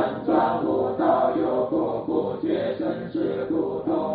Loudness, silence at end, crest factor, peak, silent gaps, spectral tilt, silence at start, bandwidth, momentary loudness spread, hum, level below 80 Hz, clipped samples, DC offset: -24 LUFS; 0 s; 16 dB; -8 dBFS; none; -6 dB/octave; 0 s; 4.7 kHz; 5 LU; none; -58 dBFS; under 0.1%; under 0.1%